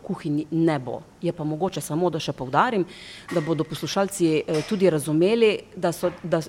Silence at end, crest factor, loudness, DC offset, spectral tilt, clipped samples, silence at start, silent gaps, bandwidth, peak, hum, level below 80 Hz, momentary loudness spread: 0 s; 18 dB; -24 LUFS; under 0.1%; -5.5 dB/octave; under 0.1%; 0.05 s; none; 16.5 kHz; -6 dBFS; none; -58 dBFS; 8 LU